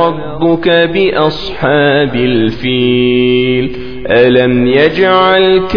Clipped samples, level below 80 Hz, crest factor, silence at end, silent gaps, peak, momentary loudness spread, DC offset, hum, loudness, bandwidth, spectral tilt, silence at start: 0.2%; -36 dBFS; 10 dB; 0 s; none; 0 dBFS; 7 LU; 3%; none; -10 LUFS; 5.4 kHz; -8 dB/octave; 0 s